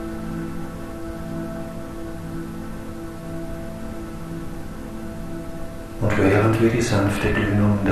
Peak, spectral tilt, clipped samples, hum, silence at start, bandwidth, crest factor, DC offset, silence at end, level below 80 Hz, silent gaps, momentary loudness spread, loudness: -4 dBFS; -6.5 dB/octave; under 0.1%; none; 0 s; 13.5 kHz; 20 dB; under 0.1%; 0 s; -36 dBFS; none; 16 LU; -25 LUFS